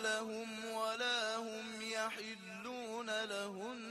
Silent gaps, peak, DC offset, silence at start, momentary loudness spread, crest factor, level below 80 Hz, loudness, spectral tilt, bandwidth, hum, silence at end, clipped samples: none; -26 dBFS; under 0.1%; 0 s; 10 LU; 16 dB; -84 dBFS; -41 LUFS; -2 dB/octave; 13 kHz; none; 0 s; under 0.1%